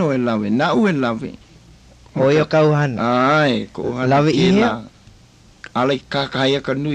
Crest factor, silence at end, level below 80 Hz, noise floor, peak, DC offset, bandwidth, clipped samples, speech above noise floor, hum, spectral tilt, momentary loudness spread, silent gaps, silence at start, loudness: 14 dB; 0 s; -50 dBFS; -48 dBFS; -4 dBFS; under 0.1%; 9.2 kHz; under 0.1%; 31 dB; none; -6.5 dB/octave; 10 LU; none; 0 s; -17 LUFS